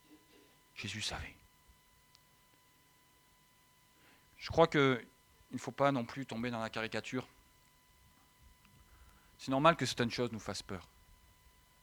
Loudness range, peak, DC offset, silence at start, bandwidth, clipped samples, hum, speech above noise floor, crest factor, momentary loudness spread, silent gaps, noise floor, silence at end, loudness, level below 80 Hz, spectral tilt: 12 LU; -10 dBFS; under 0.1%; 0.1 s; over 20 kHz; under 0.1%; none; 33 dB; 28 dB; 19 LU; none; -68 dBFS; 1 s; -35 LUFS; -64 dBFS; -5 dB/octave